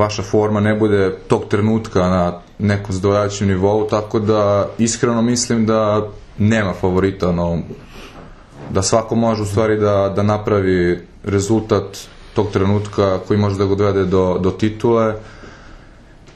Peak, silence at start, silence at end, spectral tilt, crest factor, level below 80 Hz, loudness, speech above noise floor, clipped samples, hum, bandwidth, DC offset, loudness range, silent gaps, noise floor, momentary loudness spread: 0 dBFS; 0 s; 0.05 s; -6 dB/octave; 16 dB; -42 dBFS; -17 LUFS; 26 dB; under 0.1%; none; 12 kHz; under 0.1%; 2 LU; none; -42 dBFS; 6 LU